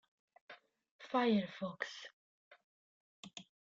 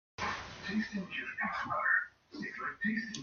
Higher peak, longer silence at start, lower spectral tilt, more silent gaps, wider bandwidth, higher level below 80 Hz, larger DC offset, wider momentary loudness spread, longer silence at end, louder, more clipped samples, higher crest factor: second, -22 dBFS vs -18 dBFS; first, 0.5 s vs 0.2 s; first, -5.5 dB/octave vs -4 dB/octave; first, 0.91-0.99 s, 2.13-2.51 s, 2.64-3.23 s vs none; about the same, 7.8 kHz vs 7.2 kHz; second, -84 dBFS vs -66 dBFS; neither; first, 25 LU vs 11 LU; first, 0.4 s vs 0 s; about the same, -38 LUFS vs -36 LUFS; neither; about the same, 20 dB vs 20 dB